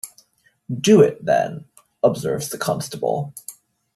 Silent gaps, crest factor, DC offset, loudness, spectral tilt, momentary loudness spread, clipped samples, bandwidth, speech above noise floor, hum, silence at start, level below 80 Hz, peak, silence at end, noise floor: none; 18 dB; under 0.1%; -20 LUFS; -5.5 dB/octave; 22 LU; under 0.1%; 14 kHz; 41 dB; none; 0.05 s; -60 dBFS; -2 dBFS; 0.45 s; -60 dBFS